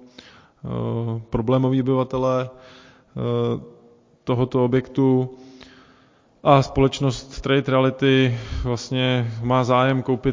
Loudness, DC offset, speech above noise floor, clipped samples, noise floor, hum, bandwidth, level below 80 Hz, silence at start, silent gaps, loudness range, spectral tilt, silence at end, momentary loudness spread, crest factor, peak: -21 LUFS; under 0.1%; 36 dB; under 0.1%; -56 dBFS; none; 7.6 kHz; -42 dBFS; 0.65 s; none; 4 LU; -7 dB/octave; 0 s; 11 LU; 22 dB; 0 dBFS